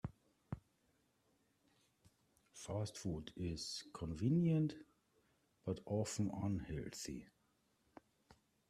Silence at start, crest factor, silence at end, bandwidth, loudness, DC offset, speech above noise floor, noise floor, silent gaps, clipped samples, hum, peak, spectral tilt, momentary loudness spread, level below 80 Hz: 0.05 s; 18 dB; 1.45 s; 13.5 kHz; -43 LUFS; under 0.1%; 38 dB; -79 dBFS; none; under 0.1%; none; -26 dBFS; -6 dB/octave; 17 LU; -66 dBFS